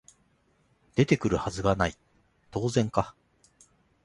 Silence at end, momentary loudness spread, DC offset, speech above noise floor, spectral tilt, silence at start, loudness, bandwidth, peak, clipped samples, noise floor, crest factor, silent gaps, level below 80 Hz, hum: 0.95 s; 8 LU; under 0.1%; 41 dB; -6 dB/octave; 0.95 s; -28 LUFS; 11.5 kHz; -6 dBFS; under 0.1%; -68 dBFS; 22 dB; none; -48 dBFS; none